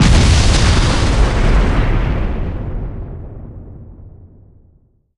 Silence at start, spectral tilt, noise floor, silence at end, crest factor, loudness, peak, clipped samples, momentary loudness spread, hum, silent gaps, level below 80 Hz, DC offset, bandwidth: 0 s; -5 dB/octave; -52 dBFS; 0.9 s; 14 dB; -15 LUFS; 0 dBFS; under 0.1%; 22 LU; none; none; -16 dBFS; under 0.1%; 11.5 kHz